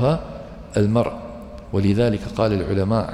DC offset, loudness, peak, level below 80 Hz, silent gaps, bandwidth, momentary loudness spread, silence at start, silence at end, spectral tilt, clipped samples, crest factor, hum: under 0.1%; -21 LUFS; -6 dBFS; -40 dBFS; none; 11.5 kHz; 17 LU; 0 s; 0 s; -8 dB/octave; under 0.1%; 16 dB; none